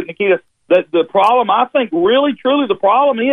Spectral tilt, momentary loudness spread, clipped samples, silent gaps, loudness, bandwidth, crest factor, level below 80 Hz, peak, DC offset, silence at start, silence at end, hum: -6.5 dB/octave; 4 LU; under 0.1%; none; -14 LUFS; 6.4 kHz; 12 dB; -62 dBFS; -2 dBFS; under 0.1%; 0 s; 0 s; none